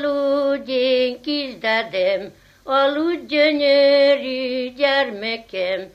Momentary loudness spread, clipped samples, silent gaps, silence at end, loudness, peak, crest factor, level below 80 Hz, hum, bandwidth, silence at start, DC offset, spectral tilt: 10 LU; under 0.1%; none; 0.05 s; -19 LUFS; -4 dBFS; 14 dB; -60 dBFS; 50 Hz at -60 dBFS; 6.8 kHz; 0 s; under 0.1%; -4.5 dB/octave